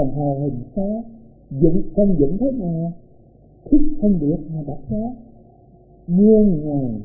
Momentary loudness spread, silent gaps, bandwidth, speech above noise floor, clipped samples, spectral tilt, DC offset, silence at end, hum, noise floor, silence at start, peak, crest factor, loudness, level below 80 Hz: 14 LU; none; 0.9 kHz; 31 dB; under 0.1%; -19 dB/octave; under 0.1%; 0 s; none; -48 dBFS; 0 s; -2 dBFS; 16 dB; -19 LUFS; -34 dBFS